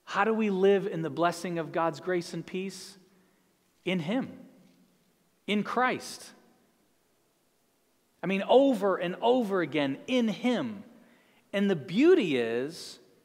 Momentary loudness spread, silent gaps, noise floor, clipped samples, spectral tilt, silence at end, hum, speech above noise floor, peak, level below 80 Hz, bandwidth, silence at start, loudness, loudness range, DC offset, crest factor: 16 LU; none; -71 dBFS; under 0.1%; -6 dB/octave; 0.3 s; none; 43 dB; -10 dBFS; -80 dBFS; 15.5 kHz; 0.05 s; -28 LUFS; 8 LU; under 0.1%; 20 dB